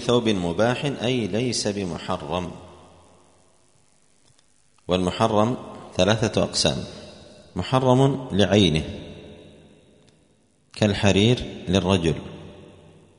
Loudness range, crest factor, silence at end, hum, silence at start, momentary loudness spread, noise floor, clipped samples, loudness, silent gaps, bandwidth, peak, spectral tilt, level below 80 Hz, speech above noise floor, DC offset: 7 LU; 22 dB; 0.5 s; none; 0 s; 21 LU; -62 dBFS; under 0.1%; -22 LUFS; none; 10.5 kHz; -2 dBFS; -5.5 dB/octave; -48 dBFS; 40 dB; under 0.1%